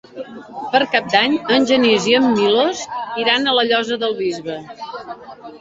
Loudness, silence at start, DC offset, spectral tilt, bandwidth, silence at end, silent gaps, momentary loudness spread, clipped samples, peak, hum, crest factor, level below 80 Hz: -16 LUFS; 0.15 s; under 0.1%; -3.5 dB/octave; 8 kHz; 0 s; none; 18 LU; under 0.1%; -2 dBFS; none; 16 dB; -60 dBFS